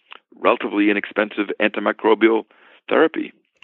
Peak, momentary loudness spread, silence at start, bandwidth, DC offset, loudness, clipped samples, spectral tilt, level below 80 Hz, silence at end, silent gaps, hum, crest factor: -2 dBFS; 7 LU; 0.4 s; 4.2 kHz; under 0.1%; -19 LUFS; under 0.1%; -8.5 dB/octave; -74 dBFS; 0.35 s; none; none; 18 dB